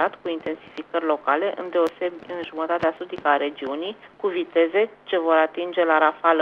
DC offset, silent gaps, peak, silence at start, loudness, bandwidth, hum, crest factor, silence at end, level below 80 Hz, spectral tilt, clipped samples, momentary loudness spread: under 0.1%; none; -4 dBFS; 0 s; -23 LUFS; 6.8 kHz; none; 20 dB; 0 s; -68 dBFS; -5.5 dB/octave; under 0.1%; 11 LU